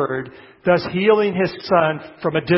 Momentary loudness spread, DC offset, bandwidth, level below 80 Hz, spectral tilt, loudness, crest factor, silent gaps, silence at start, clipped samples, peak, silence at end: 9 LU; under 0.1%; 5.8 kHz; -54 dBFS; -10.5 dB/octave; -19 LUFS; 16 dB; none; 0 s; under 0.1%; -2 dBFS; 0 s